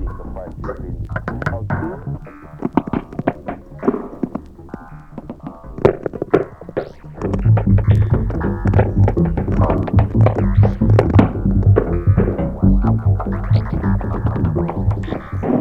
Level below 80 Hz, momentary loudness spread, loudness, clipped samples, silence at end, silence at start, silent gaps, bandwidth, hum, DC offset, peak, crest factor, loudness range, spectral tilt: -26 dBFS; 17 LU; -18 LUFS; under 0.1%; 0 s; 0 s; none; 4.7 kHz; none; under 0.1%; 0 dBFS; 16 dB; 9 LU; -10.5 dB/octave